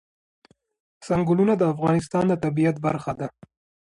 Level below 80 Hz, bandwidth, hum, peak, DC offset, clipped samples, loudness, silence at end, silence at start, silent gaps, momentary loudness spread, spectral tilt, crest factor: -56 dBFS; 11 kHz; none; -10 dBFS; under 0.1%; under 0.1%; -23 LUFS; 0.65 s; 1 s; none; 10 LU; -8 dB/octave; 14 dB